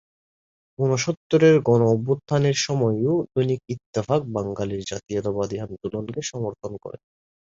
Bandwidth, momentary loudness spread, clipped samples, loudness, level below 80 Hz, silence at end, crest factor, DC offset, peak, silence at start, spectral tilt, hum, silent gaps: 7.8 kHz; 13 LU; under 0.1%; -23 LUFS; -56 dBFS; 0.5 s; 18 dB; under 0.1%; -6 dBFS; 0.8 s; -6 dB/octave; none; 1.17-1.30 s, 3.86-3.93 s